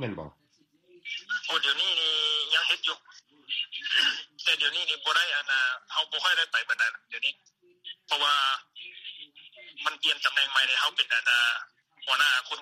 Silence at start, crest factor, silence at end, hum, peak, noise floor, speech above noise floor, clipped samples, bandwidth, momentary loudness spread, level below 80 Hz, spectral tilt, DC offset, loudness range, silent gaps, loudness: 0 s; 20 dB; 0 s; none; -10 dBFS; -65 dBFS; 38 dB; under 0.1%; 15 kHz; 18 LU; -74 dBFS; 0 dB/octave; under 0.1%; 3 LU; none; -25 LUFS